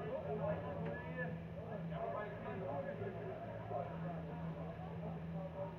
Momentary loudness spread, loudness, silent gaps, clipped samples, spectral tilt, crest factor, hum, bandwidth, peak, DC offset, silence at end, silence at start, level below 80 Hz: 5 LU; -45 LUFS; none; under 0.1%; -9.5 dB/octave; 16 dB; none; 5.4 kHz; -28 dBFS; under 0.1%; 0 s; 0 s; -64 dBFS